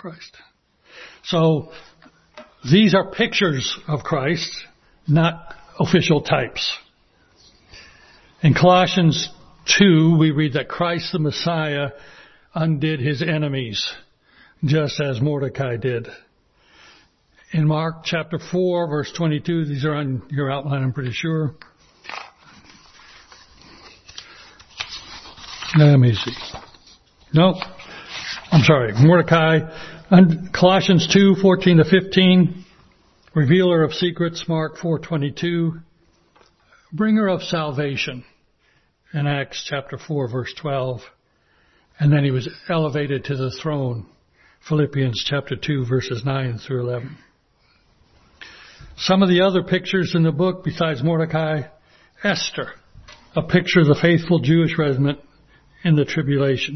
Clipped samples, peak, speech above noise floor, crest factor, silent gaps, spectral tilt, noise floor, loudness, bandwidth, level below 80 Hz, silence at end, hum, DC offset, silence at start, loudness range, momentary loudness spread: under 0.1%; 0 dBFS; 43 dB; 20 dB; none; -6 dB/octave; -61 dBFS; -19 LUFS; 6.4 kHz; -52 dBFS; 0 s; none; under 0.1%; 0.05 s; 10 LU; 18 LU